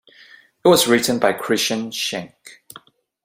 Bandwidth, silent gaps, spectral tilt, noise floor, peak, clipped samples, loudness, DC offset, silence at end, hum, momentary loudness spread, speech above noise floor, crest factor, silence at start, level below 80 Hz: 16 kHz; none; -3 dB/octave; -49 dBFS; -2 dBFS; under 0.1%; -18 LUFS; under 0.1%; 0.75 s; none; 16 LU; 31 dB; 20 dB; 0.65 s; -60 dBFS